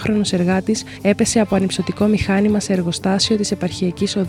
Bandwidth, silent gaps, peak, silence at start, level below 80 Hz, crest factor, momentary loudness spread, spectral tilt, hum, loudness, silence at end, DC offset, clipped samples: 13.5 kHz; none; -4 dBFS; 0 s; -42 dBFS; 14 dB; 5 LU; -5 dB/octave; none; -18 LUFS; 0 s; under 0.1%; under 0.1%